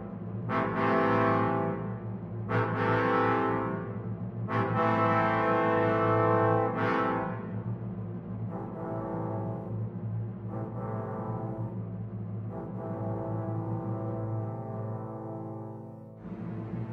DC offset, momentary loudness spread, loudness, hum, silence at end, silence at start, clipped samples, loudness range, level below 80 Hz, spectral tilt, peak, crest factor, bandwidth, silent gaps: under 0.1%; 13 LU; -31 LUFS; none; 0 s; 0 s; under 0.1%; 9 LU; -58 dBFS; -9.5 dB/octave; -14 dBFS; 18 dB; 6 kHz; none